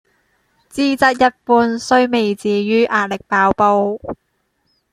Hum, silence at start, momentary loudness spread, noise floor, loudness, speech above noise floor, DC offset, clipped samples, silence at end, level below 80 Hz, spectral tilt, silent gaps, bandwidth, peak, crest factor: none; 0.75 s; 10 LU; -67 dBFS; -15 LUFS; 52 dB; under 0.1%; under 0.1%; 0.8 s; -52 dBFS; -5 dB/octave; none; 14.5 kHz; 0 dBFS; 16 dB